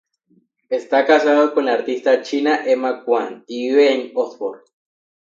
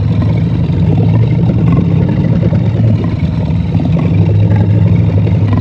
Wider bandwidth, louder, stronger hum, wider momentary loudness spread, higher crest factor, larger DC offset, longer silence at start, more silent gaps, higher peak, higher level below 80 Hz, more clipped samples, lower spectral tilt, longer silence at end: first, 7.6 kHz vs 5.6 kHz; second, -18 LUFS vs -11 LUFS; neither; first, 11 LU vs 3 LU; first, 18 dB vs 10 dB; neither; first, 0.7 s vs 0 s; neither; about the same, -2 dBFS vs 0 dBFS; second, -76 dBFS vs -26 dBFS; neither; second, -3.5 dB/octave vs -10.5 dB/octave; first, 0.65 s vs 0 s